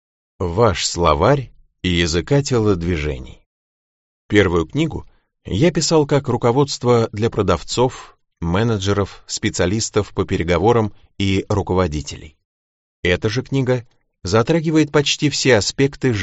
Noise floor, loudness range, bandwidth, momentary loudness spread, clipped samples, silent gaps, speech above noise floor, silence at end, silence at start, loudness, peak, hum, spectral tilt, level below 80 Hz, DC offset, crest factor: under -90 dBFS; 3 LU; 8.2 kHz; 9 LU; under 0.1%; 3.46-4.29 s, 12.45-13.03 s; over 73 dB; 0 s; 0.4 s; -18 LUFS; 0 dBFS; none; -5 dB/octave; -38 dBFS; under 0.1%; 18 dB